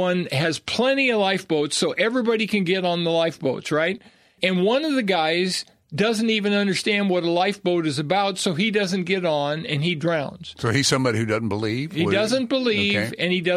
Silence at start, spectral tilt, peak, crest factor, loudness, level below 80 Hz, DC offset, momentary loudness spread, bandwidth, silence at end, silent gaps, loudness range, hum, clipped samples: 0 s; -4.5 dB/octave; -4 dBFS; 18 dB; -22 LUFS; -62 dBFS; under 0.1%; 5 LU; 14.5 kHz; 0 s; none; 1 LU; none; under 0.1%